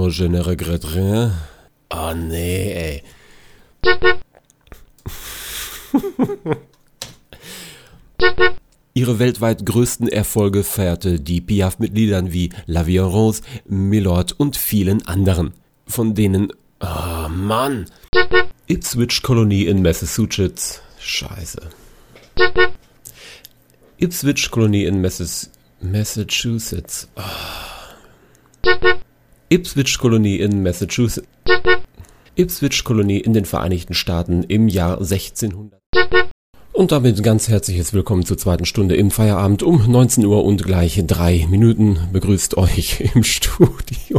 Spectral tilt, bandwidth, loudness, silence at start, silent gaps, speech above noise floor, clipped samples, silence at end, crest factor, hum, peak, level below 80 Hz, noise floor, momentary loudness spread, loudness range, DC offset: -5 dB/octave; over 20 kHz; -17 LUFS; 0 s; 18.08-18.13 s, 35.86-35.93 s, 36.31-36.53 s; 35 dB; under 0.1%; 0 s; 18 dB; none; 0 dBFS; -32 dBFS; -51 dBFS; 13 LU; 7 LU; under 0.1%